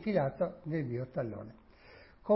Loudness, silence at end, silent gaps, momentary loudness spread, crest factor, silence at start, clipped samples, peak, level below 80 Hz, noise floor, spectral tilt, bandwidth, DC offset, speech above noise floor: -36 LUFS; 0 s; none; 24 LU; 18 dB; 0 s; under 0.1%; -16 dBFS; -64 dBFS; -57 dBFS; -8 dB/octave; 5.6 kHz; under 0.1%; 23 dB